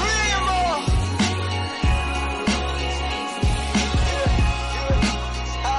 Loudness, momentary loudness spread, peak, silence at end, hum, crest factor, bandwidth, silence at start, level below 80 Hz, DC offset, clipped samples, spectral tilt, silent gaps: -22 LUFS; 5 LU; -12 dBFS; 0 s; none; 10 dB; 11.5 kHz; 0 s; -26 dBFS; under 0.1%; under 0.1%; -4.5 dB/octave; none